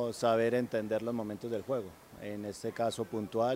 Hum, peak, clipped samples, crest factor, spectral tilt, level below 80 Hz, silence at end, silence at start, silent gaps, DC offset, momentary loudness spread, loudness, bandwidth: none; -16 dBFS; under 0.1%; 18 dB; -5.5 dB/octave; -70 dBFS; 0 s; 0 s; none; under 0.1%; 11 LU; -34 LUFS; 16 kHz